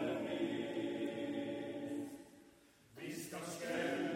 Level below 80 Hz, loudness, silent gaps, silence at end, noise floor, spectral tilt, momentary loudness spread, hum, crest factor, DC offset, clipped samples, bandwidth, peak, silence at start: -80 dBFS; -42 LUFS; none; 0 s; -65 dBFS; -4.5 dB/octave; 14 LU; none; 16 dB; under 0.1%; under 0.1%; 16 kHz; -26 dBFS; 0 s